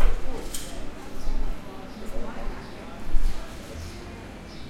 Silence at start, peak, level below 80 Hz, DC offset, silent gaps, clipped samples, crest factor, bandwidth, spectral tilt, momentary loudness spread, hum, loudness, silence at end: 0 s; -4 dBFS; -28 dBFS; under 0.1%; none; under 0.1%; 18 dB; 13 kHz; -4.5 dB/octave; 7 LU; none; -37 LUFS; 0 s